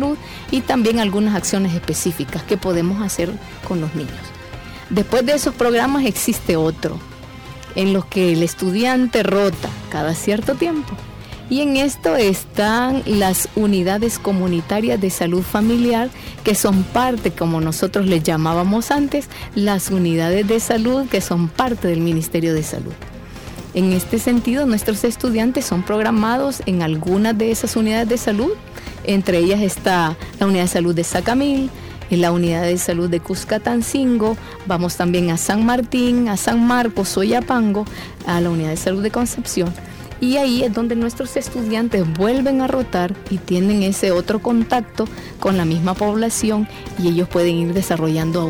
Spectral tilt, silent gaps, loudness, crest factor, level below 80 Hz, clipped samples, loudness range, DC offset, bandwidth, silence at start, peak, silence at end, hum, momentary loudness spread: -5 dB/octave; none; -18 LUFS; 16 dB; -40 dBFS; under 0.1%; 2 LU; under 0.1%; over 20 kHz; 0 s; -2 dBFS; 0 s; none; 9 LU